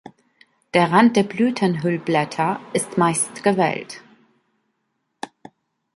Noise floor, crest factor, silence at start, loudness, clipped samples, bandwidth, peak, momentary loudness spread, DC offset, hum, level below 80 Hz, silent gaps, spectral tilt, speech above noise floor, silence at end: -74 dBFS; 20 dB; 0.75 s; -20 LUFS; under 0.1%; 11.5 kHz; -2 dBFS; 22 LU; under 0.1%; none; -66 dBFS; none; -5 dB/octave; 54 dB; 0.7 s